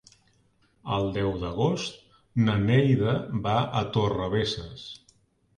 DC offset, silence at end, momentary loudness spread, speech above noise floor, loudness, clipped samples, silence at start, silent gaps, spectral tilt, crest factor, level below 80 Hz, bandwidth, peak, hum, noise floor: under 0.1%; 0.6 s; 17 LU; 40 dB; -26 LUFS; under 0.1%; 0.85 s; none; -7 dB/octave; 18 dB; -50 dBFS; 10 kHz; -10 dBFS; none; -65 dBFS